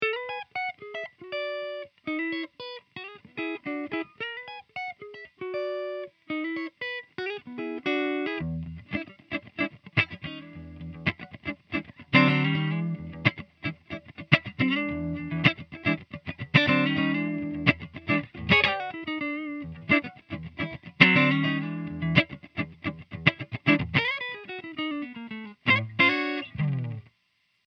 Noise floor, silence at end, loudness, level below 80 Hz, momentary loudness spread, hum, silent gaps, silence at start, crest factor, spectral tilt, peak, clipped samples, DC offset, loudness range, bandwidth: -72 dBFS; 0.65 s; -27 LUFS; -56 dBFS; 17 LU; none; none; 0 s; 28 dB; -7 dB/octave; 0 dBFS; under 0.1%; under 0.1%; 10 LU; 6.4 kHz